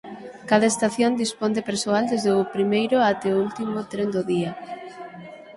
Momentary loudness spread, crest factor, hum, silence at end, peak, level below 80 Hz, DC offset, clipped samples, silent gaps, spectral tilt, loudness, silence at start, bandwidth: 18 LU; 20 dB; none; 0 s; -4 dBFS; -64 dBFS; under 0.1%; under 0.1%; none; -4.5 dB/octave; -22 LUFS; 0.05 s; 11.5 kHz